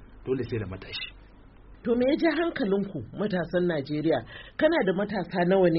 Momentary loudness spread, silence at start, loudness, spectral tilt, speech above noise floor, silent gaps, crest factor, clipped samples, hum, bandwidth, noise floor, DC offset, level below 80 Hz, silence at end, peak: 12 LU; 0 s; -27 LUFS; -5.5 dB/octave; 24 dB; none; 16 dB; under 0.1%; none; 5.8 kHz; -51 dBFS; under 0.1%; -52 dBFS; 0 s; -10 dBFS